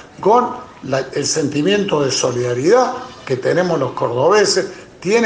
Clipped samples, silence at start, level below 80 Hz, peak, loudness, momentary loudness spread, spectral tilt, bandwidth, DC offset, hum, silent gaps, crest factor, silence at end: under 0.1%; 0.05 s; -56 dBFS; -2 dBFS; -16 LUFS; 10 LU; -4 dB/octave; 10 kHz; under 0.1%; none; none; 14 dB; 0 s